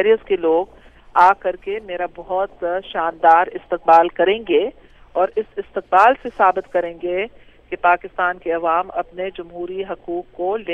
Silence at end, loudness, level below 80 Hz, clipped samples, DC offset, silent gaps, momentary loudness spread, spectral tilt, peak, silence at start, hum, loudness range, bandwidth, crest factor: 0 s; -19 LUFS; -50 dBFS; under 0.1%; under 0.1%; none; 14 LU; -5.5 dB/octave; -2 dBFS; 0 s; none; 5 LU; 7.8 kHz; 18 dB